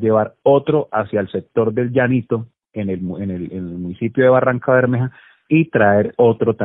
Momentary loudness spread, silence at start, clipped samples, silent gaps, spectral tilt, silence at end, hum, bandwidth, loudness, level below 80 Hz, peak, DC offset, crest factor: 12 LU; 0 s; under 0.1%; none; -12.5 dB/octave; 0 s; none; 4 kHz; -17 LUFS; -56 dBFS; -2 dBFS; under 0.1%; 14 dB